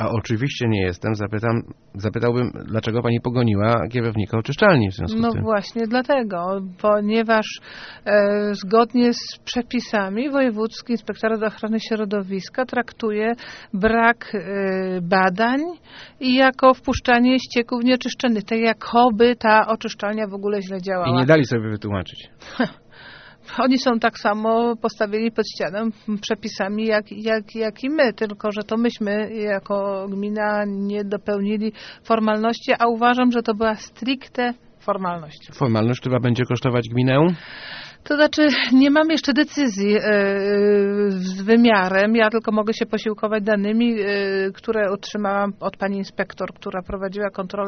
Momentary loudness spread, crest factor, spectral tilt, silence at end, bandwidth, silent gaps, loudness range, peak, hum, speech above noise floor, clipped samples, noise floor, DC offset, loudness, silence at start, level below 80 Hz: 10 LU; 20 dB; -4.5 dB/octave; 0 s; 6.6 kHz; none; 5 LU; -2 dBFS; none; 23 dB; under 0.1%; -43 dBFS; under 0.1%; -20 LUFS; 0 s; -50 dBFS